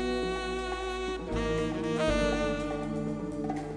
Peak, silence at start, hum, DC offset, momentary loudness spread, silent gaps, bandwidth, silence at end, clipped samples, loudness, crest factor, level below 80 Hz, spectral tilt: -14 dBFS; 0 s; none; under 0.1%; 6 LU; none; 11 kHz; 0 s; under 0.1%; -32 LUFS; 18 dB; -42 dBFS; -5.5 dB/octave